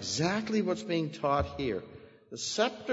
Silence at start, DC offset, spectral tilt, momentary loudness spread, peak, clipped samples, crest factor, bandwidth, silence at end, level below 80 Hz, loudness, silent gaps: 0 s; under 0.1%; -4.5 dB/octave; 9 LU; -14 dBFS; under 0.1%; 18 dB; 8 kHz; 0 s; -54 dBFS; -31 LUFS; none